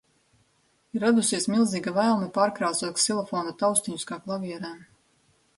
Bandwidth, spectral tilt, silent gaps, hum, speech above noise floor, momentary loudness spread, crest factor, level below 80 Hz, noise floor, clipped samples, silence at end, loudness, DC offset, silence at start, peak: 12 kHz; -3.5 dB/octave; none; none; 42 dB; 11 LU; 18 dB; -70 dBFS; -67 dBFS; under 0.1%; 0.75 s; -25 LUFS; under 0.1%; 0.95 s; -8 dBFS